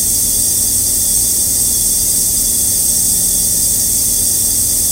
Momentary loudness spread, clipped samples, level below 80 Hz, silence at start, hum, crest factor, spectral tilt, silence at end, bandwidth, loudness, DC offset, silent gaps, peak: 1 LU; under 0.1%; -32 dBFS; 0 s; none; 14 dB; -0.5 dB/octave; 0 s; 16 kHz; -10 LUFS; under 0.1%; none; 0 dBFS